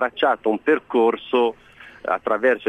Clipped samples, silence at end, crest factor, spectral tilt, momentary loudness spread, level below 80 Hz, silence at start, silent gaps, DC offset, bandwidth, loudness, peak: under 0.1%; 0 s; 14 dB; -6 dB/octave; 5 LU; -62 dBFS; 0 s; none; under 0.1%; 9 kHz; -21 LUFS; -6 dBFS